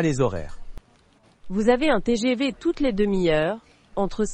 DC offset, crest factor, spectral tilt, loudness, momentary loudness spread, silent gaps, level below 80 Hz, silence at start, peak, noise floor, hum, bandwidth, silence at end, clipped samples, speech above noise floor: under 0.1%; 18 dB; -6 dB/octave; -23 LUFS; 13 LU; none; -40 dBFS; 0 s; -6 dBFS; -58 dBFS; none; 8.8 kHz; 0 s; under 0.1%; 36 dB